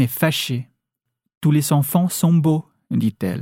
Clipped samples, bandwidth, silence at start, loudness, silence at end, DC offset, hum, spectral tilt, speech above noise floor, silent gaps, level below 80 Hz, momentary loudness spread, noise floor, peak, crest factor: under 0.1%; 17.5 kHz; 0 s; -19 LUFS; 0 s; under 0.1%; none; -5.5 dB/octave; 62 dB; 1.37-1.41 s; -62 dBFS; 8 LU; -80 dBFS; -4 dBFS; 16 dB